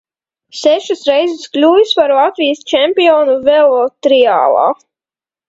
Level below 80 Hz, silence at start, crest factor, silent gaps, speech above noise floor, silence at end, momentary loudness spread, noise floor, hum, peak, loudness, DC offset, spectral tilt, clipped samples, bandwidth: -58 dBFS; 0.55 s; 12 dB; none; over 79 dB; 0.75 s; 6 LU; under -90 dBFS; none; 0 dBFS; -11 LUFS; under 0.1%; -3 dB/octave; under 0.1%; 8 kHz